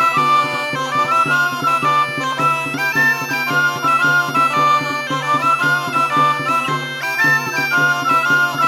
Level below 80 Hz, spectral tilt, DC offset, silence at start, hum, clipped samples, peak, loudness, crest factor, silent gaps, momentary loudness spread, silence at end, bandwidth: -64 dBFS; -3.5 dB/octave; under 0.1%; 0 s; none; under 0.1%; -4 dBFS; -15 LUFS; 12 dB; none; 5 LU; 0 s; 17 kHz